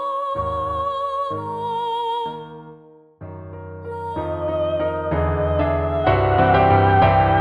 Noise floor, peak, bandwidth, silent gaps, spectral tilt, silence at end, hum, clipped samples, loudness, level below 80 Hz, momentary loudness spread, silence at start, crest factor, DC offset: -46 dBFS; -2 dBFS; 5 kHz; none; -8.5 dB/octave; 0 s; none; under 0.1%; -20 LUFS; -36 dBFS; 20 LU; 0 s; 18 dB; under 0.1%